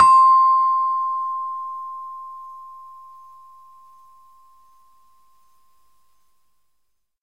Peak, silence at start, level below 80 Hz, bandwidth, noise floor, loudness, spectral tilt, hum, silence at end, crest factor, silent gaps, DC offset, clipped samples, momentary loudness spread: -2 dBFS; 0 s; -68 dBFS; 8.8 kHz; -73 dBFS; -18 LUFS; -1.5 dB/octave; none; 4.35 s; 20 dB; none; 0.2%; under 0.1%; 27 LU